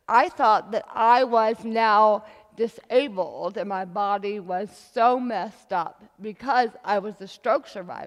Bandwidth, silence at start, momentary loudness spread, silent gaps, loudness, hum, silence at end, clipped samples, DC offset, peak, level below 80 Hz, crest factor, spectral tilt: 12 kHz; 0.1 s; 12 LU; none; -24 LUFS; none; 0 s; under 0.1%; under 0.1%; -6 dBFS; -72 dBFS; 18 dB; -5 dB/octave